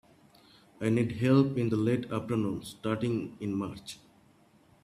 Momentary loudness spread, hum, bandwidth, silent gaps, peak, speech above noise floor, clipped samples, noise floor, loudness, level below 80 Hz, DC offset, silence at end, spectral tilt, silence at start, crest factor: 13 LU; none; 14 kHz; none; -12 dBFS; 33 dB; under 0.1%; -62 dBFS; -30 LUFS; -64 dBFS; under 0.1%; 0.9 s; -7.5 dB/octave; 0.8 s; 20 dB